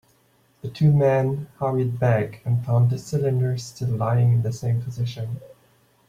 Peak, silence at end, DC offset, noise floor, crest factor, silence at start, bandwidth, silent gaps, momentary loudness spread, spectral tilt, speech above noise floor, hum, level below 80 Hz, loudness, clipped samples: -8 dBFS; 0.6 s; under 0.1%; -61 dBFS; 14 dB; 0.65 s; 9.6 kHz; none; 10 LU; -8 dB/octave; 40 dB; none; -56 dBFS; -23 LUFS; under 0.1%